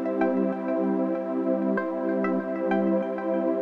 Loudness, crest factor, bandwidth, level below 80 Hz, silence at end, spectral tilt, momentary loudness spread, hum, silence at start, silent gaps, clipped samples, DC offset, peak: -26 LUFS; 14 dB; 5 kHz; -70 dBFS; 0 s; -10 dB/octave; 3 LU; none; 0 s; none; under 0.1%; under 0.1%; -12 dBFS